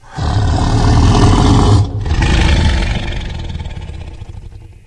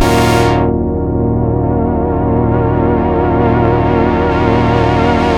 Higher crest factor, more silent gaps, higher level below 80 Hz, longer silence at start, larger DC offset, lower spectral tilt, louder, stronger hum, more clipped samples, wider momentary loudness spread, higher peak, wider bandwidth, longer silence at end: about the same, 12 dB vs 12 dB; neither; first, -16 dBFS vs -22 dBFS; about the same, 0.1 s vs 0 s; neither; about the same, -6 dB/octave vs -7 dB/octave; about the same, -13 LUFS vs -12 LUFS; neither; neither; first, 20 LU vs 3 LU; about the same, 0 dBFS vs 0 dBFS; second, 10.5 kHz vs 16 kHz; first, 0.15 s vs 0 s